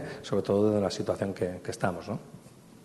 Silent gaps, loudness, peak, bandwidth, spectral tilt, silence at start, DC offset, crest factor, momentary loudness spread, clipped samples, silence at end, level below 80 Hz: none; -30 LUFS; -14 dBFS; 12.5 kHz; -6.5 dB/octave; 0 s; under 0.1%; 18 dB; 13 LU; under 0.1%; 0 s; -64 dBFS